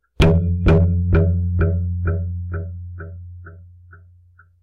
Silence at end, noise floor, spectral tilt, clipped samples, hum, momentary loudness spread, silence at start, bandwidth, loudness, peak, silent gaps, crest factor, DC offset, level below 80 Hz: 0.65 s; -51 dBFS; -8.5 dB/octave; under 0.1%; none; 19 LU; 0.2 s; 6.4 kHz; -19 LUFS; -6 dBFS; none; 12 dB; under 0.1%; -28 dBFS